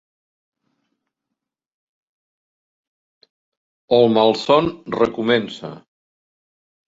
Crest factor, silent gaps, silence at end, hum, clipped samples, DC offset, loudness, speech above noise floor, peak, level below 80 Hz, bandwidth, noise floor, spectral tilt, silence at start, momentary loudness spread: 22 dB; none; 1.15 s; none; under 0.1%; under 0.1%; -17 LUFS; 65 dB; -2 dBFS; -60 dBFS; 7.8 kHz; -82 dBFS; -6 dB/octave; 3.9 s; 16 LU